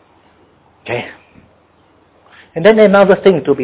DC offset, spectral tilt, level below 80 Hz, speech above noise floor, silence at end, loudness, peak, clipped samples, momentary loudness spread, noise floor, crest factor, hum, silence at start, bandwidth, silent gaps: under 0.1%; -10 dB/octave; -52 dBFS; 41 dB; 0 s; -11 LUFS; 0 dBFS; under 0.1%; 21 LU; -51 dBFS; 14 dB; none; 0.85 s; 4 kHz; none